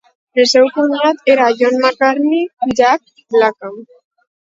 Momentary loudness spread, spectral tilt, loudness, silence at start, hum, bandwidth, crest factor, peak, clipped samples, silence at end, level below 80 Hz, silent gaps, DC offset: 7 LU; -3 dB/octave; -13 LUFS; 0.35 s; none; 7.8 kHz; 14 dB; 0 dBFS; under 0.1%; 0.65 s; -58 dBFS; 2.53-2.57 s; under 0.1%